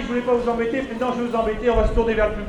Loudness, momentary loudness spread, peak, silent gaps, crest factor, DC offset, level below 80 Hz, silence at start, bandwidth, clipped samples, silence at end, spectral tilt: -21 LUFS; 4 LU; -8 dBFS; none; 14 dB; under 0.1%; -30 dBFS; 0 s; 10 kHz; under 0.1%; 0 s; -7 dB/octave